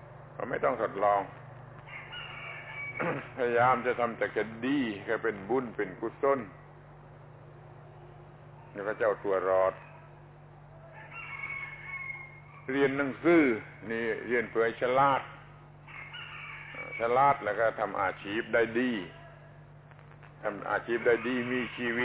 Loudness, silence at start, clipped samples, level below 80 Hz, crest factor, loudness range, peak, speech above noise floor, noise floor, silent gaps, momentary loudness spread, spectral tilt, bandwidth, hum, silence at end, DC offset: -30 LUFS; 0 s; under 0.1%; -64 dBFS; 20 dB; 6 LU; -12 dBFS; 23 dB; -52 dBFS; none; 24 LU; -4 dB/octave; 4 kHz; 50 Hz at -75 dBFS; 0 s; under 0.1%